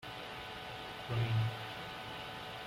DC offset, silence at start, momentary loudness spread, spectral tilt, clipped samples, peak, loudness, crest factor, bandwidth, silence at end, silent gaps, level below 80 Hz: under 0.1%; 0 s; 10 LU; -5.5 dB/octave; under 0.1%; -24 dBFS; -40 LUFS; 16 dB; 15.5 kHz; 0 s; none; -62 dBFS